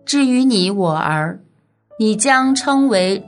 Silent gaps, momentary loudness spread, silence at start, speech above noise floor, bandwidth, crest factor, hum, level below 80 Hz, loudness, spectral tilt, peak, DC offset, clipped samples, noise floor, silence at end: none; 7 LU; 0.05 s; 37 dB; 11 kHz; 14 dB; none; -64 dBFS; -15 LUFS; -4 dB/octave; -2 dBFS; under 0.1%; under 0.1%; -52 dBFS; 0.05 s